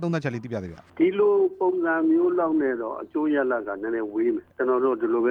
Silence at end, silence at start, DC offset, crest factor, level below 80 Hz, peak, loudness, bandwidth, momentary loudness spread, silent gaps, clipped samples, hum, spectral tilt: 0 s; 0 s; under 0.1%; 14 dB; -64 dBFS; -10 dBFS; -24 LUFS; 6.6 kHz; 9 LU; none; under 0.1%; none; -8.5 dB/octave